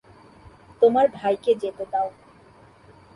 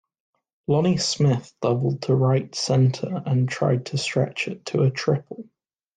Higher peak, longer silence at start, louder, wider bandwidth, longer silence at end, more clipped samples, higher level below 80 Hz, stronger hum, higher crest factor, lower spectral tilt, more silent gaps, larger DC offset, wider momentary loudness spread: about the same, -6 dBFS vs -8 dBFS; about the same, 0.8 s vs 0.7 s; about the same, -22 LUFS vs -23 LUFS; first, 11 kHz vs 9.4 kHz; first, 1.05 s vs 0.55 s; neither; about the same, -60 dBFS vs -60 dBFS; neither; first, 20 dB vs 14 dB; about the same, -6.5 dB/octave vs -6 dB/octave; neither; neither; about the same, 9 LU vs 7 LU